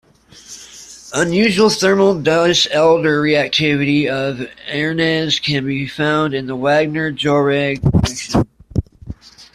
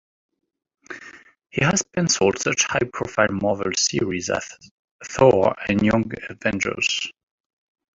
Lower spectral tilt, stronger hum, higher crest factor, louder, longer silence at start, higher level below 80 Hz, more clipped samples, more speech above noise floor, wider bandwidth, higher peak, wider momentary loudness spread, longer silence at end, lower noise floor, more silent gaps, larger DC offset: first, -5 dB/octave vs -3.5 dB/octave; neither; second, 14 dB vs 20 dB; first, -16 LUFS vs -21 LUFS; second, 0.5 s vs 0.9 s; first, -38 dBFS vs -50 dBFS; neither; about the same, 22 dB vs 24 dB; first, 14 kHz vs 8.2 kHz; about the same, -2 dBFS vs -2 dBFS; first, 21 LU vs 15 LU; second, 0.1 s vs 0.85 s; second, -38 dBFS vs -45 dBFS; second, none vs 4.71-4.99 s; neither